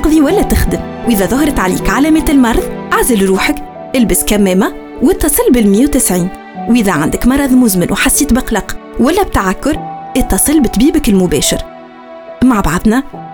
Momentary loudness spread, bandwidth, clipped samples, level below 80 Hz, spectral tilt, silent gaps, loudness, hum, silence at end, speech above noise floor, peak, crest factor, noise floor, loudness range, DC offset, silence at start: 8 LU; over 20 kHz; under 0.1%; -24 dBFS; -4.5 dB/octave; none; -11 LUFS; none; 0 s; 21 dB; 0 dBFS; 10 dB; -31 dBFS; 2 LU; under 0.1%; 0 s